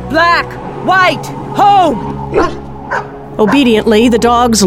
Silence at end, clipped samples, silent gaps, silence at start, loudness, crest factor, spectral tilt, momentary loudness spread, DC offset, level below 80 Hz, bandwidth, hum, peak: 0 s; under 0.1%; none; 0 s; -11 LUFS; 10 dB; -4.5 dB/octave; 11 LU; 0.6%; -32 dBFS; 16.5 kHz; none; 0 dBFS